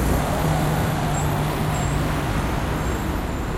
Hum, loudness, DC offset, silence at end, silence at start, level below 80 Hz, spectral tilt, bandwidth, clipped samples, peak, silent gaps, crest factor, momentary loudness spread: none; -23 LUFS; under 0.1%; 0 s; 0 s; -30 dBFS; -5.5 dB/octave; 16.5 kHz; under 0.1%; -8 dBFS; none; 14 dB; 3 LU